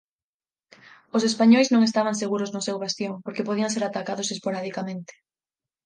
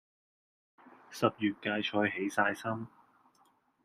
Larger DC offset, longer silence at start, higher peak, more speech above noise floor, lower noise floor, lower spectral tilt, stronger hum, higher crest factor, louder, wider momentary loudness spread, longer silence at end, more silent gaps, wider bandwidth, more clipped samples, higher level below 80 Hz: neither; first, 1.15 s vs 0.85 s; first, -6 dBFS vs -12 dBFS; first, over 67 dB vs 37 dB; first, under -90 dBFS vs -70 dBFS; about the same, -4.5 dB/octave vs -5 dB/octave; neither; second, 18 dB vs 24 dB; first, -24 LUFS vs -32 LUFS; about the same, 13 LU vs 11 LU; second, 0.75 s vs 0.95 s; neither; second, 10 kHz vs 15 kHz; neither; about the same, -74 dBFS vs -76 dBFS